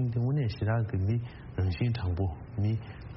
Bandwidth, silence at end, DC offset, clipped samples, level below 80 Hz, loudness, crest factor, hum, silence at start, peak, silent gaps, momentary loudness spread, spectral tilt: 5.8 kHz; 0 s; under 0.1%; under 0.1%; -48 dBFS; -31 LUFS; 12 dB; none; 0 s; -18 dBFS; none; 5 LU; -8 dB/octave